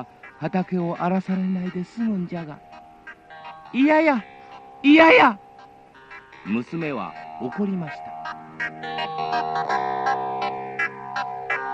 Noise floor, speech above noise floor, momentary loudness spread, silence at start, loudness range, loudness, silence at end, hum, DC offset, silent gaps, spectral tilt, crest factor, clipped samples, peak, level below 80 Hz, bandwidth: -48 dBFS; 27 dB; 24 LU; 0 s; 10 LU; -22 LUFS; 0 s; none; under 0.1%; none; -7 dB/octave; 22 dB; under 0.1%; -2 dBFS; -64 dBFS; 7.8 kHz